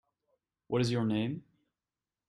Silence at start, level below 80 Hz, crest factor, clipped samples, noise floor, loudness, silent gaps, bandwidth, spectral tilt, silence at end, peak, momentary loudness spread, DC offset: 0.7 s; -68 dBFS; 18 dB; under 0.1%; under -90 dBFS; -32 LUFS; none; 11 kHz; -6.5 dB/octave; 0.9 s; -18 dBFS; 8 LU; under 0.1%